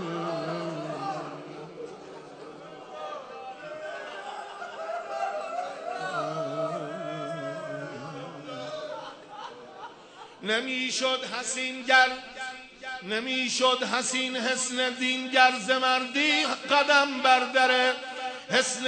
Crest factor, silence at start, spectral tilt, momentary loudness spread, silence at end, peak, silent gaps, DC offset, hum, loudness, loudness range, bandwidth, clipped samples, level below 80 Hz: 24 dB; 0 s; -2 dB/octave; 21 LU; 0 s; -4 dBFS; none; under 0.1%; none; -26 LUFS; 16 LU; 9.4 kHz; under 0.1%; -76 dBFS